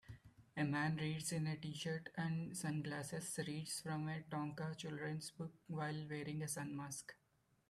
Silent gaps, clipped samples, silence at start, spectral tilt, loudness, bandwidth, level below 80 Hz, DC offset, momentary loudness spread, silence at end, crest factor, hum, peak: none; under 0.1%; 0.05 s; -5 dB/octave; -44 LUFS; 14.5 kHz; -76 dBFS; under 0.1%; 8 LU; 0.55 s; 18 dB; none; -28 dBFS